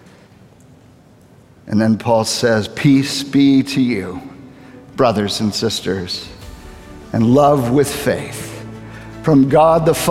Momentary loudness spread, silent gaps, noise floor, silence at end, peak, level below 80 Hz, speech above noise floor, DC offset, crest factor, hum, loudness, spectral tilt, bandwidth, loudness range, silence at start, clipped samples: 20 LU; none; -46 dBFS; 0 s; 0 dBFS; -44 dBFS; 32 dB; under 0.1%; 16 dB; none; -15 LUFS; -5.5 dB/octave; 16 kHz; 4 LU; 1.65 s; under 0.1%